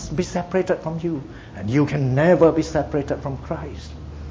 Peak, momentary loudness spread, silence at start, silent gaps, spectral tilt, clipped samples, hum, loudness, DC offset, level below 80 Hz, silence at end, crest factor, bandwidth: -2 dBFS; 18 LU; 0 s; none; -7.5 dB/octave; under 0.1%; none; -21 LUFS; under 0.1%; -40 dBFS; 0 s; 20 dB; 7.8 kHz